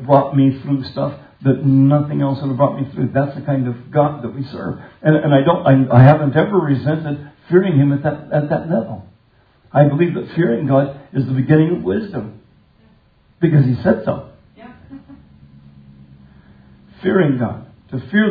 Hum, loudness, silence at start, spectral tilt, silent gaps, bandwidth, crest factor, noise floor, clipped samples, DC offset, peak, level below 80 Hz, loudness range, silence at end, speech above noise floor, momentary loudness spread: none; -16 LUFS; 0 s; -11.5 dB/octave; none; 4.9 kHz; 16 dB; -54 dBFS; under 0.1%; under 0.1%; 0 dBFS; -52 dBFS; 9 LU; 0 s; 39 dB; 13 LU